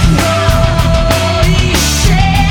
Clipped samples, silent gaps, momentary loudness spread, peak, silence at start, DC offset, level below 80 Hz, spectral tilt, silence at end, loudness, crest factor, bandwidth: under 0.1%; none; 1 LU; 0 dBFS; 0 s; under 0.1%; -14 dBFS; -4.5 dB/octave; 0 s; -10 LUFS; 10 dB; 19 kHz